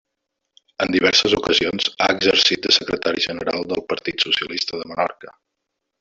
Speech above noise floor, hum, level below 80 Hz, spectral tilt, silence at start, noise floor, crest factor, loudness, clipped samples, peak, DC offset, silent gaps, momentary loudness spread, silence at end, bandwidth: 59 dB; none; -54 dBFS; -2.5 dB/octave; 0.8 s; -79 dBFS; 20 dB; -18 LUFS; under 0.1%; -2 dBFS; under 0.1%; none; 10 LU; 0.7 s; 8 kHz